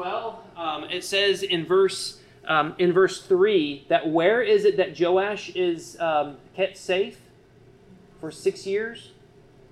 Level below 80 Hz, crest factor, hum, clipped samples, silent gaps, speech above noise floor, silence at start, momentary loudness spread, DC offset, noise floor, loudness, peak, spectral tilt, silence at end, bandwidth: -64 dBFS; 16 dB; none; under 0.1%; none; 30 dB; 0 s; 13 LU; under 0.1%; -53 dBFS; -24 LUFS; -8 dBFS; -4.5 dB/octave; 0.65 s; 12.5 kHz